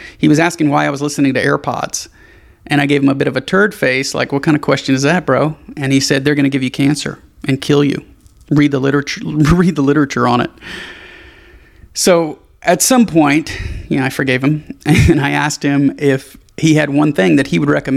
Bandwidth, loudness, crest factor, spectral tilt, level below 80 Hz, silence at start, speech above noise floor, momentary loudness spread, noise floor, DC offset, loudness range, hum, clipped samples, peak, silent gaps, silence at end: 15.5 kHz; -14 LUFS; 14 dB; -5 dB/octave; -34 dBFS; 0 s; 29 dB; 10 LU; -42 dBFS; under 0.1%; 2 LU; none; under 0.1%; 0 dBFS; none; 0 s